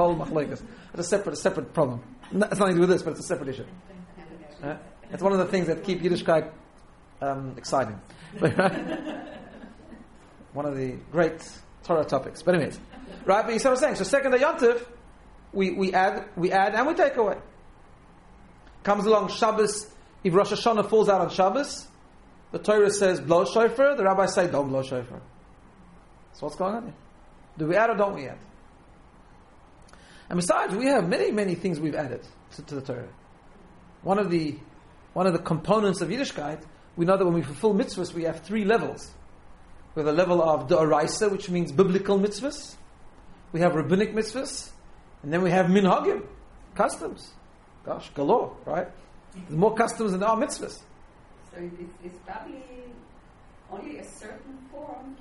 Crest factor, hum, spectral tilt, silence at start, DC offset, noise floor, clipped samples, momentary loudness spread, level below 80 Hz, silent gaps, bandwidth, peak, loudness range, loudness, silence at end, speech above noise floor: 22 dB; none; -5.5 dB/octave; 0 s; under 0.1%; -52 dBFS; under 0.1%; 20 LU; -54 dBFS; none; 11.5 kHz; -4 dBFS; 7 LU; -25 LUFS; 0.05 s; 27 dB